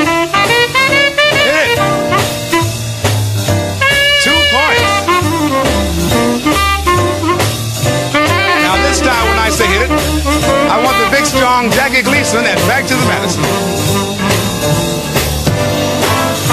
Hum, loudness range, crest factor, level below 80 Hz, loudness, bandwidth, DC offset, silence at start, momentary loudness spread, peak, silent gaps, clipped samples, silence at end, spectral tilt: none; 2 LU; 12 dB; -26 dBFS; -11 LUFS; 15.5 kHz; under 0.1%; 0 s; 5 LU; 0 dBFS; none; under 0.1%; 0 s; -3.5 dB/octave